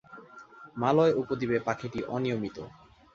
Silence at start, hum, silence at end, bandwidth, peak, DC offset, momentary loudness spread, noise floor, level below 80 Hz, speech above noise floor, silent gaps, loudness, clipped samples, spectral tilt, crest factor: 0.1 s; none; 0.45 s; 7.4 kHz; -10 dBFS; under 0.1%; 24 LU; -50 dBFS; -62 dBFS; 22 dB; none; -29 LUFS; under 0.1%; -7 dB/octave; 20 dB